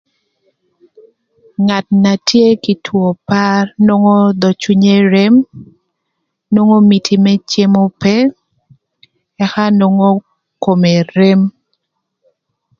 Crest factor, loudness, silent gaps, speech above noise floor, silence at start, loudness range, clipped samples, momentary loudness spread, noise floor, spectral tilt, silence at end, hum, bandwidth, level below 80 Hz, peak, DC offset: 12 dB; -11 LUFS; none; 61 dB; 1.6 s; 3 LU; under 0.1%; 7 LU; -71 dBFS; -6.5 dB/octave; 1.3 s; none; 7.2 kHz; -54 dBFS; 0 dBFS; under 0.1%